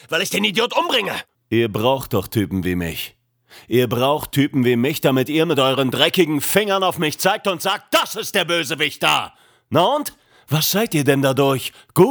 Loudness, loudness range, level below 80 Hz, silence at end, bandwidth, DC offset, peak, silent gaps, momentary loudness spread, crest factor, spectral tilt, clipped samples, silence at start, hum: -18 LUFS; 3 LU; -52 dBFS; 0 s; over 20 kHz; under 0.1%; 0 dBFS; none; 7 LU; 18 dB; -4.5 dB/octave; under 0.1%; 0.1 s; none